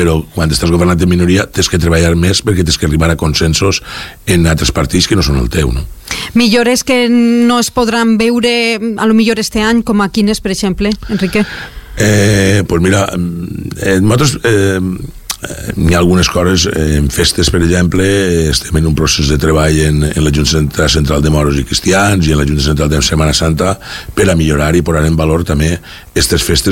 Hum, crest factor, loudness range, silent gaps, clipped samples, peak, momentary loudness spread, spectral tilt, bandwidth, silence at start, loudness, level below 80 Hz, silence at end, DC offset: none; 10 dB; 2 LU; none; under 0.1%; 0 dBFS; 6 LU; -5 dB/octave; 17 kHz; 0 s; -11 LUFS; -22 dBFS; 0 s; under 0.1%